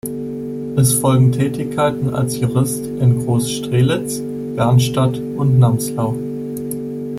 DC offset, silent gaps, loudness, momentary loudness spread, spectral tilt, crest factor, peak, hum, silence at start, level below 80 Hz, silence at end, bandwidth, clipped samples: under 0.1%; none; -17 LUFS; 11 LU; -6 dB/octave; 14 dB; -2 dBFS; none; 0.05 s; -46 dBFS; 0 s; 15.5 kHz; under 0.1%